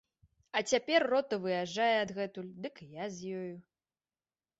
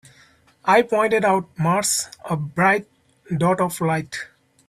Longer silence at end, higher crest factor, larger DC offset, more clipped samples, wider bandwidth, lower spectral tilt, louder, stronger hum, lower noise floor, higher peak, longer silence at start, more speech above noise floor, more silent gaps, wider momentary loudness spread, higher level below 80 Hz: first, 1 s vs 0.4 s; about the same, 20 dB vs 18 dB; neither; neither; second, 8 kHz vs 15.5 kHz; about the same, -3.5 dB/octave vs -4.5 dB/octave; second, -33 LUFS vs -20 LUFS; neither; first, under -90 dBFS vs -55 dBFS; second, -14 dBFS vs -4 dBFS; about the same, 0.55 s vs 0.65 s; first, over 57 dB vs 35 dB; neither; first, 16 LU vs 10 LU; second, -76 dBFS vs -60 dBFS